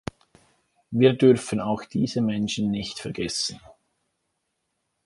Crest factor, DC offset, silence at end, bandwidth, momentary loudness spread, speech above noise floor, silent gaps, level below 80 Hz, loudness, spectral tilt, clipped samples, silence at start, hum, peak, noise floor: 22 dB; under 0.1%; 1.35 s; 11.5 kHz; 12 LU; 54 dB; none; -56 dBFS; -24 LUFS; -5.5 dB/octave; under 0.1%; 0.9 s; none; -4 dBFS; -77 dBFS